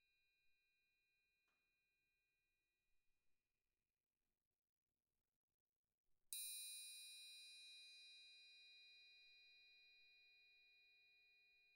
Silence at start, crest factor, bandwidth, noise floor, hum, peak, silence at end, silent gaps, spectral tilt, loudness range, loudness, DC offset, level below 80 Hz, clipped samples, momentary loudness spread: 0 s; 30 dB; 16 kHz; under -90 dBFS; none; -34 dBFS; 0 s; 4.47-4.51 s, 4.58-4.62 s, 4.69-4.87 s, 5.36-5.48 s, 5.54-5.84 s, 5.94-6.04 s; 5 dB/octave; 11 LU; -57 LUFS; under 0.1%; under -90 dBFS; under 0.1%; 17 LU